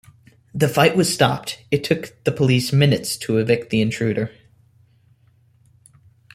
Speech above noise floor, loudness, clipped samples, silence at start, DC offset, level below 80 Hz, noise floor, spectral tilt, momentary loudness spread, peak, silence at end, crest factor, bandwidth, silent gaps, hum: 38 dB; -19 LUFS; under 0.1%; 0.55 s; under 0.1%; -54 dBFS; -57 dBFS; -5.5 dB/octave; 9 LU; -2 dBFS; 2.05 s; 18 dB; 16 kHz; none; none